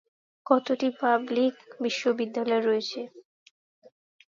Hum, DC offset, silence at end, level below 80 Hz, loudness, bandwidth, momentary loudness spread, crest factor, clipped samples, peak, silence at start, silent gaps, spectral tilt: none; under 0.1%; 1.1 s; -82 dBFS; -27 LUFS; 7.6 kHz; 11 LU; 22 dB; under 0.1%; -6 dBFS; 0.45 s; none; -4 dB/octave